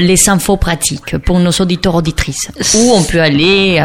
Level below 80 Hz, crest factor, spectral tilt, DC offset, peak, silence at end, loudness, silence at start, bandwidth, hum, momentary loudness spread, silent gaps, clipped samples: -26 dBFS; 10 dB; -4 dB/octave; under 0.1%; 0 dBFS; 0 s; -11 LUFS; 0 s; 17 kHz; none; 7 LU; none; under 0.1%